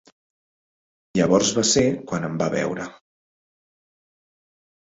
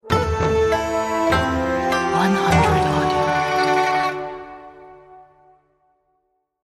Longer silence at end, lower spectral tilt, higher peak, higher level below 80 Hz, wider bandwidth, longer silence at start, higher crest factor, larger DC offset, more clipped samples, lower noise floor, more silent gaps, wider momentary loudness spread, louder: first, 2.05 s vs 1.4 s; second, -4 dB/octave vs -5.5 dB/octave; about the same, -4 dBFS vs -4 dBFS; second, -54 dBFS vs -36 dBFS; second, 8 kHz vs 15 kHz; first, 1.15 s vs 0.05 s; about the same, 20 dB vs 16 dB; neither; neither; first, under -90 dBFS vs -70 dBFS; neither; about the same, 10 LU vs 10 LU; about the same, -21 LUFS vs -19 LUFS